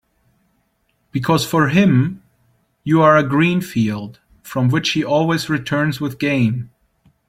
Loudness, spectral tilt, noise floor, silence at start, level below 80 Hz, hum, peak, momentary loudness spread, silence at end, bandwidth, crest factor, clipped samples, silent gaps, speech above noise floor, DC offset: -17 LUFS; -6 dB/octave; -65 dBFS; 1.15 s; -52 dBFS; none; -2 dBFS; 14 LU; 0.6 s; 16.5 kHz; 16 dB; under 0.1%; none; 49 dB; under 0.1%